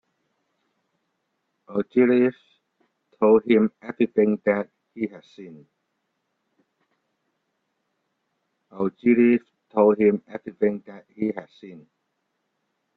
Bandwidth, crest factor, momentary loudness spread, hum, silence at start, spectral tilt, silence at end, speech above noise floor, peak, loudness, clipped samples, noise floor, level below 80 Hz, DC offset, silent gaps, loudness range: 4.3 kHz; 20 dB; 14 LU; none; 1.7 s; -9.5 dB/octave; 1.2 s; 54 dB; -4 dBFS; -22 LUFS; under 0.1%; -76 dBFS; -68 dBFS; under 0.1%; none; 10 LU